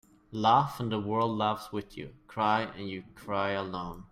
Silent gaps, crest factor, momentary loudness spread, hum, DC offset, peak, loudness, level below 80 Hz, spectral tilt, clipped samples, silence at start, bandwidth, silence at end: none; 20 dB; 17 LU; none; under 0.1%; -10 dBFS; -30 LUFS; -60 dBFS; -6.5 dB/octave; under 0.1%; 0.3 s; 16 kHz; 0.1 s